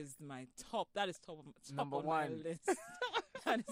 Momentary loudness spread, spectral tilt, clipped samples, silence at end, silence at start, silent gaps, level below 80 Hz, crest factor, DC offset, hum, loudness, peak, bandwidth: 13 LU; -4 dB/octave; under 0.1%; 0 s; 0 s; none; -78 dBFS; 18 dB; under 0.1%; none; -41 LUFS; -22 dBFS; 15.5 kHz